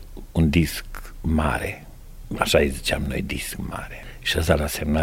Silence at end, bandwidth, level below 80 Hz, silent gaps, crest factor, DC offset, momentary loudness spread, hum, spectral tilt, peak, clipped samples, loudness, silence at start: 0 s; 16.5 kHz; -32 dBFS; none; 22 dB; under 0.1%; 14 LU; none; -5 dB/octave; -2 dBFS; under 0.1%; -24 LUFS; 0 s